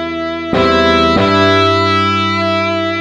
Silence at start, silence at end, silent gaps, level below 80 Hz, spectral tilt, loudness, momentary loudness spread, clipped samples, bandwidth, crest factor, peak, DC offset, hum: 0 s; 0 s; none; -36 dBFS; -5.5 dB/octave; -12 LUFS; 6 LU; under 0.1%; 10 kHz; 12 dB; 0 dBFS; under 0.1%; none